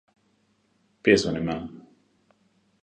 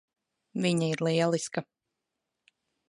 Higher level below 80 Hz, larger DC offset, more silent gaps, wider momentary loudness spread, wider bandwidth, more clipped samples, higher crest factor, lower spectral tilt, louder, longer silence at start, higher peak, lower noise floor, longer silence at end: first, -54 dBFS vs -78 dBFS; neither; neither; first, 14 LU vs 10 LU; second, 9.8 kHz vs 11.5 kHz; neither; first, 24 dB vs 18 dB; about the same, -5 dB/octave vs -5.5 dB/octave; first, -24 LUFS vs -29 LUFS; first, 1.05 s vs 0.55 s; first, -4 dBFS vs -14 dBFS; second, -68 dBFS vs -85 dBFS; second, 1 s vs 1.3 s